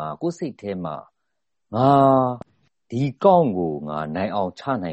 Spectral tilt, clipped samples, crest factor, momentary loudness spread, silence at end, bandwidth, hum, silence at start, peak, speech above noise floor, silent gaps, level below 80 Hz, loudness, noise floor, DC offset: -8.5 dB/octave; under 0.1%; 20 dB; 15 LU; 0 s; 8.2 kHz; none; 0 s; -2 dBFS; 60 dB; none; -58 dBFS; -21 LUFS; -81 dBFS; under 0.1%